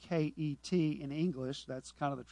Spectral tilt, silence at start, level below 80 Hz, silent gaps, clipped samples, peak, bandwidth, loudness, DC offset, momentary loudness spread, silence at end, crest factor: -7 dB/octave; 0 s; -66 dBFS; none; under 0.1%; -22 dBFS; 10.5 kHz; -37 LUFS; under 0.1%; 8 LU; 0 s; 14 dB